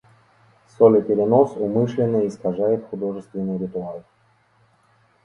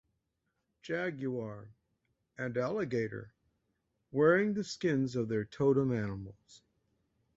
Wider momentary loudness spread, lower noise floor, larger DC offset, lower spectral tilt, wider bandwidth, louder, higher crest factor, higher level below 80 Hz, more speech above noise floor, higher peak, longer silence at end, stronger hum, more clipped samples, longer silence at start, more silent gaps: second, 13 LU vs 17 LU; second, -60 dBFS vs -83 dBFS; neither; first, -9.5 dB/octave vs -7 dB/octave; about the same, 7.4 kHz vs 8 kHz; first, -20 LUFS vs -33 LUFS; about the same, 20 dB vs 20 dB; first, -60 dBFS vs -66 dBFS; second, 40 dB vs 50 dB; first, -2 dBFS vs -14 dBFS; first, 1.25 s vs 0.8 s; neither; neither; about the same, 0.8 s vs 0.85 s; neither